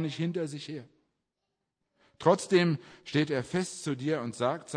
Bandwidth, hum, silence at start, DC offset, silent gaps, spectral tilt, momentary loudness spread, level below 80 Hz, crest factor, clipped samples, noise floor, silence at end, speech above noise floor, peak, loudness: 10.5 kHz; none; 0 s; under 0.1%; none; -5.5 dB/octave; 11 LU; -72 dBFS; 22 dB; under 0.1%; -84 dBFS; 0 s; 55 dB; -8 dBFS; -30 LUFS